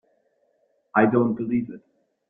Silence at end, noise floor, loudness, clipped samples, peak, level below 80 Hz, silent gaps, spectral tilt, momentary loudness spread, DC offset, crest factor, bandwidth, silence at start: 0.5 s; -68 dBFS; -22 LUFS; under 0.1%; -4 dBFS; -64 dBFS; none; -11.5 dB/octave; 17 LU; under 0.1%; 22 dB; 3.6 kHz; 0.95 s